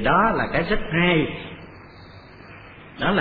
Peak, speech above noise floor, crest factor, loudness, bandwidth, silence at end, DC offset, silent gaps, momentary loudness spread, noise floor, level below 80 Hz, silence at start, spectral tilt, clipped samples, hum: -6 dBFS; 23 dB; 18 dB; -21 LUFS; 5 kHz; 0 s; under 0.1%; none; 24 LU; -44 dBFS; -38 dBFS; 0 s; -9 dB/octave; under 0.1%; none